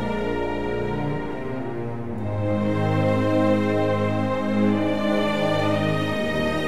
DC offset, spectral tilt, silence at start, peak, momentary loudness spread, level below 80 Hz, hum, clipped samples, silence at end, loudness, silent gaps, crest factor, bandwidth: 2%; -7.5 dB/octave; 0 s; -8 dBFS; 9 LU; -44 dBFS; none; under 0.1%; 0 s; -23 LUFS; none; 14 dB; 14 kHz